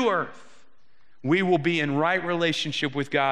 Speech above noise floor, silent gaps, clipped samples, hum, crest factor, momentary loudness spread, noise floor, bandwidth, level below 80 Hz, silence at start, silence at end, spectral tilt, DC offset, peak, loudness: 42 dB; none; under 0.1%; none; 18 dB; 6 LU; -67 dBFS; 11 kHz; -72 dBFS; 0 s; 0 s; -5.5 dB/octave; 0.5%; -8 dBFS; -24 LUFS